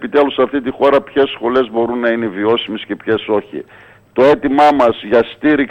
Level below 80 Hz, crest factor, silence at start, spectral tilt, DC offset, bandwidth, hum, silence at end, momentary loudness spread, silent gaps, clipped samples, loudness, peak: -50 dBFS; 14 dB; 0 s; -6.5 dB/octave; under 0.1%; 8.6 kHz; none; 0 s; 8 LU; none; under 0.1%; -14 LUFS; 0 dBFS